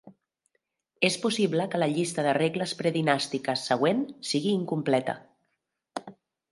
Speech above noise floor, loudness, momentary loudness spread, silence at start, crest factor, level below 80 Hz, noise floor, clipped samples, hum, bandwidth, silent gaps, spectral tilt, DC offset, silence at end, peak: 53 dB; -27 LUFS; 11 LU; 0.05 s; 22 dB; -74 dBFS; -80 dBFS; under 0.1%; none; 11.5 kHz; none; -4.5 dB/octave; under 0.1%; 0.4 s; -6 dBFS